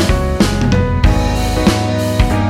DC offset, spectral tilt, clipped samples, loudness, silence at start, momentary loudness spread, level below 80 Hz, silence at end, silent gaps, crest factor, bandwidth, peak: under 0.1%; -6 dB/octave; under 0.1%; -14 LUFS; 0 s; 2 LU; -18 dBFS; 0 s; none; 12 dB; 16 kHz; 0 dBFS